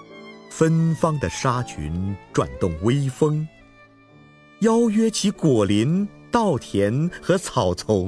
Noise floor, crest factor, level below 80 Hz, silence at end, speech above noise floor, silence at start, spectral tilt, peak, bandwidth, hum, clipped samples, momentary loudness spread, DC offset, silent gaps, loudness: -50 dBFS; 18 dB; -46 dBFS; 0 s; 30 dB; 0 s; -6 dB/octave; -4 dBFS; 11 kHz; none; under 0.1%; 9 LU; under 0.1%; none; -22 LUFS